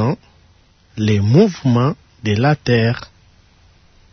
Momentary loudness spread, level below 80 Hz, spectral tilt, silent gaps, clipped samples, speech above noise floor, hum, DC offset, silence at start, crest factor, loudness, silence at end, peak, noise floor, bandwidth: 13 LU; -50 dBFS; -7.5 dB/octave; none; under 0.1%; 37 dB; none; under 0.1%; 0 s; 16 dB; -16 LUFS; 1.05 s; -2 dBFS; -52 dBFS; 6.6 kHz